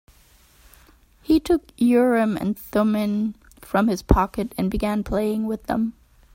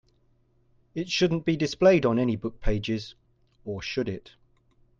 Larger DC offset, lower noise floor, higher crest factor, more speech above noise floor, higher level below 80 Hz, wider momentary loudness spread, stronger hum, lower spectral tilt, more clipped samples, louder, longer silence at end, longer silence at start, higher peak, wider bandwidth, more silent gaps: neither; second, -54 dBFS vs -65 dBFS; about the same, 22 dB vs 20 dB; second, 33 dB vs 40 dB; about the same, -36 dBFS vs -40 dBFS; second, 7 LU vs 18 LU; neither; about the same, -7 dB/octave vs -6 dB/octave; neither; first, -22 LUFS vs -26 LUFS; second, 0.45 s vs 0.8 s; first, 1.3 s vs 0.95 s; first, 0 dBFS vs -8 dBFS; first, 16.5 kHz vs 7.6 kHz; neither